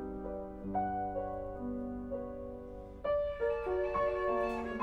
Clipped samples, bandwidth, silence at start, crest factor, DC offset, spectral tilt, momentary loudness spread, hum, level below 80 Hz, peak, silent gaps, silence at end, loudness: under 0.1%; 8.4 kHz; 0 s; 14 dB; under 0.1%; -8 dB/octave; 10 LU; none; -52 dBFS; -22 dBFS; none; 0 s; -37 LUFS